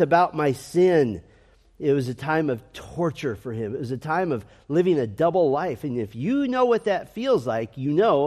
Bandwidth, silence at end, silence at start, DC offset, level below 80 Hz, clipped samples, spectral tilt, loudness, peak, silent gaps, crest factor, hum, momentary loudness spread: 13.5 kHz; 0 s; 0 s; under 0.1%; -58 dBFS; under 0.1%; -7 dB/octave; -24 LUFS; -6 dBFS; none; 16 dB; none; 10 LU